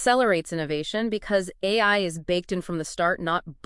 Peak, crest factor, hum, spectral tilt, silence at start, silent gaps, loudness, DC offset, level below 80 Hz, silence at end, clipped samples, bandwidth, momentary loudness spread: -8 dBFS; 16 dB; none; -4 dB/octave; 0 s; none; -25 LUFS; under 0.1%; -52 dBFS; 0.1 s; under 0.1%; 12 kHz; 8 LU